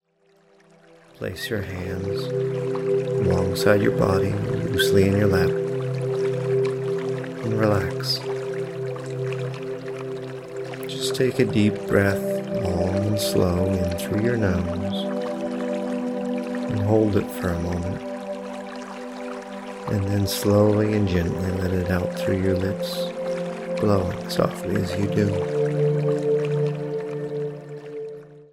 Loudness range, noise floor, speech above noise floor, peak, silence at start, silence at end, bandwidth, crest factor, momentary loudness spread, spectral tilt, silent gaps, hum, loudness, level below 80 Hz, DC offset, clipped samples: 5 LU; -60 dBFS; 39 dB; -4 dBFS; 1.2 s; 0.05 s; 16 kHz; 20 dB; 12 LU; -6.5 dB/octave; none; none; -24 LUFS; -48 dBFS; under 0.1%; under 0.1%